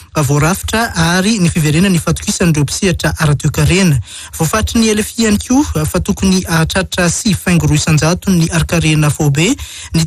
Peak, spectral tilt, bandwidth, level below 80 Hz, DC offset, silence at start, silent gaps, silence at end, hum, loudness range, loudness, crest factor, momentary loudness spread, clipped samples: -2 dBFS; -5 dB/octave; 15 kHz; -28 dBFS; under 0.1%; 0 s; none; 0 s; none; 1 LU; -13 LUFS; 10 dB; 4 LU; under 0.1%